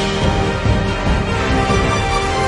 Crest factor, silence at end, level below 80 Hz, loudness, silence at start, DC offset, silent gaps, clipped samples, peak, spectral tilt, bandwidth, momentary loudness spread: 14 dB; 0 s; -24 dBFS; -17 LUFS; 0 s; under 0.1%; none; under 0.1%; -2 dBFS; -5.5 dB/octave; 11.5 kHz; 2 LU